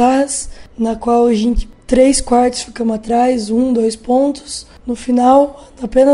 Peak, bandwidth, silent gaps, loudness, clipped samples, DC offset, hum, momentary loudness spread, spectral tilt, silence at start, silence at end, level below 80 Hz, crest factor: 0 dBFS; 11.5 kHz; none; -14 LUFS; under 0.1%; under 0.1%; none; 13 LU; -4.5 dB/octave; 0 s; 0 s; -30 dBFS; 14 dB